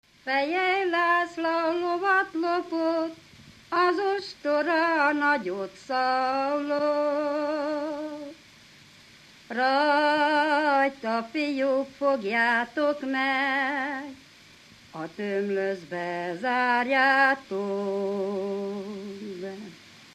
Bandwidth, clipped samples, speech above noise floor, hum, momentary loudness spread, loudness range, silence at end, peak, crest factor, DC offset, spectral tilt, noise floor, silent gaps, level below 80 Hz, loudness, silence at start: 13.5 kHz; under 0.1%; 27 dB; none; 13 LU; 4 LU; 0.1 s; -8 dBFS; 18 dB; under 0.1%; -5 dB/octave; -53 dBFS; none; -72 dBFS; -26 LUFS; 0.25 s